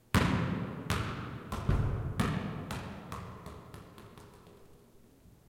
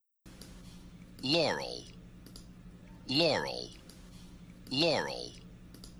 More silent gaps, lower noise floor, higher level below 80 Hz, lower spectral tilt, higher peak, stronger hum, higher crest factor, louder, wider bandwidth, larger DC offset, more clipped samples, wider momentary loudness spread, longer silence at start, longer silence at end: neither; first, -59 dBFS vs -54 dBFS; first, -44 dBFS vs -58 dBFS; first, -6 dB/octave vs -4 dB/octave; first, -8 dBFS vs -16 dBFS; neither; first, 28 dB vs 20 dB; second, -35 LUFS vs -32 LUFS; second, 16.5 kHz vs over 20 kHz; neither; neither; second, 21 LU vs 24 LU; about the same, 0.15 s vs 0.25 s; first, 0.2 s vs 0 s